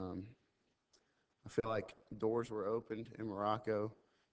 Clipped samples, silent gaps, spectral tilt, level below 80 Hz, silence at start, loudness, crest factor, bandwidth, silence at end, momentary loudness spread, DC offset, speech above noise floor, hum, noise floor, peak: under 0.1%; none; -7 dB/octave; -70 dBFS; 0 s; -41 LUFS; 20 dB; 8 kHz; 0.4 s; 12 LU; under 0.1%; 41 dB; none; -81 dBFS; -22 dBFS